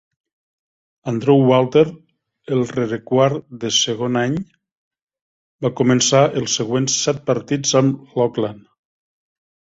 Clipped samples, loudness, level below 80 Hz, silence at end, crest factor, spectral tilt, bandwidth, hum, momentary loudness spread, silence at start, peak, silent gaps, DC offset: under 0.1%; -18 LUFS; -58 dBFS; 1.15 s; 18 dB; -4.5 dB/octave; 8 kHz; none; 11 LU; 1.05 s; -2 dBFS; 4.72-4.91 s, 5.02-5.08 s, 5.22-5.59 s; under 0.1%